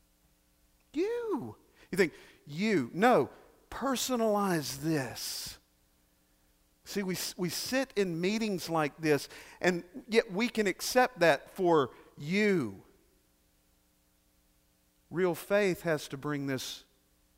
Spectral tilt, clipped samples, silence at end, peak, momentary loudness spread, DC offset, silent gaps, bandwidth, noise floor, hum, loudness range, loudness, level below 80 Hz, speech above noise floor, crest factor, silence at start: -4.5 dB/octave; under 0.1%; 0.55 s; -12 dBFS; 12 LU; under 0.1%; none; 16 kHz; -70 dBFS; none; 7 LU; -31 LUFS; -66 dBFS; 39 dB; 22 dB; 0.95 s